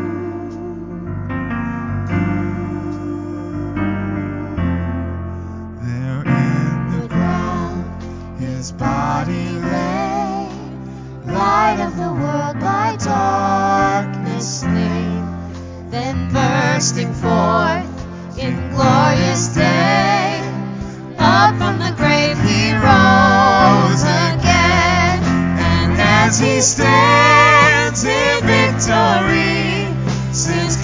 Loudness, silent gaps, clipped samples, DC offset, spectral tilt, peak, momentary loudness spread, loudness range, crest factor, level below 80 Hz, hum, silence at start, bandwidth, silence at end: -15 LUFS; none; under 0.1%; under 0.1%; -4.5 dB/octave; 0 dBFS; 16 LU; 11 LU; 16 dB; -32 dBFS; none; 0 s; 7.6 kHz; 0 s